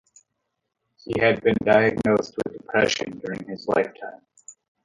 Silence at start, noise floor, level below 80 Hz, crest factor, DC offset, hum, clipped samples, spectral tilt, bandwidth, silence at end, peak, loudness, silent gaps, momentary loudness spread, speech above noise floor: 1.05 s; -78 dBFS; -56 dBFS; 20 dB; under 0.1%; none; under 0.1%; -5 dB/octave; 11 kHz; 0.35 s; -4 dBFS; -23 LUFS; none; 14 LU; 56 dB